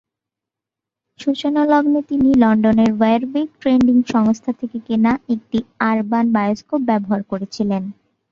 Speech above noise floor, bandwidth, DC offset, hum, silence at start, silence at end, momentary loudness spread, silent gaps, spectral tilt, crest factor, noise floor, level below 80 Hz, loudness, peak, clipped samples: 69 dB; 7.2 kHz; under 0.1%; none; 1.2 s; 0.4 s; 9 LU; none; -7 dB/octave; 16 dB; -85 dBFS; -52 dBFS; -17 LUFS; 0 dBFS; under 0.1%